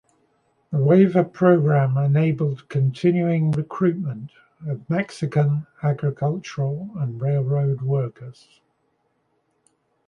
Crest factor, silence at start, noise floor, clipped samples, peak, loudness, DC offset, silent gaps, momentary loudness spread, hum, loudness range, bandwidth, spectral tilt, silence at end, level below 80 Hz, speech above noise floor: 18 dB; 0.7 s; -69 dBFS; under 0.1%; -4 dBFS; -21 LUFS; under 0.1%; none; 14 LU; none; 7 LU; 7 kHz; -9 dB/octave; 1.75 s; -62 dBFS; 48 dB